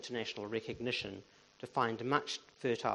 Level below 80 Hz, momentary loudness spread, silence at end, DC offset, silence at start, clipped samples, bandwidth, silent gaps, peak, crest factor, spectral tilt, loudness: -72 dBFS; 10 LU; 0 s; under 0.1%; 0 s; under 0.1%; 11 kHz; none; -16 dBFS; 22 dB; -4.5 dB/octave; -37 LUFS